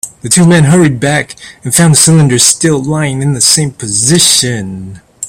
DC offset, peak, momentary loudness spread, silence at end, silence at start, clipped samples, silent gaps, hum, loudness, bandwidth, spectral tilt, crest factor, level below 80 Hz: under 0.1%; 0 dBFS; 11 LU; 0 s; 0.05 s; 0.5%; none; none; -7 LUFS; over 20 kHz; -3.5 dB/octave; 10 dB; -42 dBFS